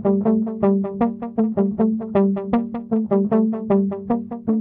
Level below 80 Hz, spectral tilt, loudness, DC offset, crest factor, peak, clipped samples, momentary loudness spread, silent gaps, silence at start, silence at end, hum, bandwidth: -54 dBFS; -12.5 dB/octave; -21 LUFS; under 0.1%; 14 dB; -6 dBFS; under 0.1%; 5 LU; none; 0 s; 0 s; none; 3.7 kHz